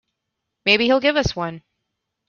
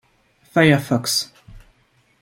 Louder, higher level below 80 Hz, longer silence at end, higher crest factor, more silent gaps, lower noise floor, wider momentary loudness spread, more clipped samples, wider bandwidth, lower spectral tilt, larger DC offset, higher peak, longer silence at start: about the same, -18 LUFS vs -18 LUFS; first, -44 dBFS vs -52 dBFS; about the same, 0.7 s vs 0.65 s; about the same, 20 dB vs 20 dB; neither; first, -79 dBFS vs -60 dBFS; first, 13 LU vs 8 LU; neither; second, 7.2 kHz vs 16.5 kHz; about the same, -4.5 dB/octave vs -4.5 dB/octave; neither; about the same, -2 dBFS vs -2 dBFS; about the same, 0.65 s vs 0.55 s